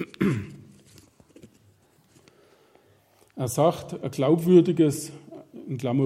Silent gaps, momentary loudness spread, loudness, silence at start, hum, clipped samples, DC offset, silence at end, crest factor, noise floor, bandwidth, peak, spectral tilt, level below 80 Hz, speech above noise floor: none; 24 LU; -24 LUFS; 0 s; none; under 0.1%; under 0.1%; 0 s; 20 dB; -60 dBFS; 16 kHz; -6 dBFS; -7 dB/octave; -64 dBFS; 38 dB